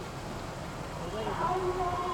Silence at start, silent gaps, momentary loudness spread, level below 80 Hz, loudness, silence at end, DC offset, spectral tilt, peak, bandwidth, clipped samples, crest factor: 0 s; none; 9 LU; -48 dBFS; -34 LUFS; 0 s; under 0.1%; -5.5 dB/octave; -20 dBFS; 19 kHz; under 0.1%; 14 dB